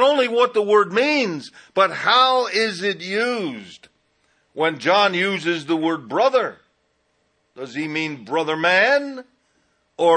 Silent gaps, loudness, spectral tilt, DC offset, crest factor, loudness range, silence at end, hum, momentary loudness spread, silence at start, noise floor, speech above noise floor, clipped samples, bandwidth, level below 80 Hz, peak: none; -19 LUFS; -4 dB/octave; under 0.1%; 16 dB; 4 LU; 0 s; none; 13 LU; 0 s; -67 dBFS; 47 dB; under 0.1%; 10 kHz; -74 dBFS; -4 dBFS